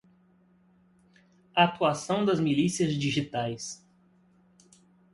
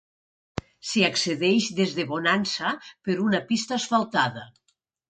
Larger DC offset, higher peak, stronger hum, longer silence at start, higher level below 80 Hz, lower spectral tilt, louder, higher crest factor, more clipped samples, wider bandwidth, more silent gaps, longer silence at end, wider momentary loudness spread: neither; about the same, -8 dBFS vs -6 dBFS; neither; first, 1.55 s vs 0.55 s; about the same, -64 dBFS vs -60 dBFS; about the same, -5 dB/octave vs -4 dB/octave; second, -27 LUFS vs -24 LUFS; about the same, 22 dB vs 20 dB; neither; first, 11.5 kHz vs 9.4 kHz; neither; first, 1.4 s vs 0.6 s; about the same, 12 LU vs 12 LU